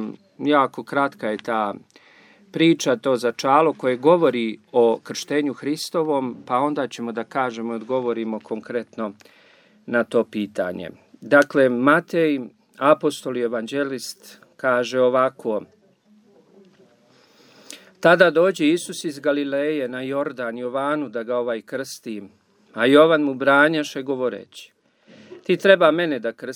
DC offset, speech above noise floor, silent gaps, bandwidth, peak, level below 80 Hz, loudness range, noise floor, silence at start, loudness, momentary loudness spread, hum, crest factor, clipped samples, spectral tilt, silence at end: under 0.1%; 36 dB; none; 18.5 kHz; 0 dBFS; -76 dBFS; 6 LU; -57 dBFS; 0 s; -21 LUFS; 15 LU; none; 20 dB; under 0.1%; -5 dB/octave; 0 s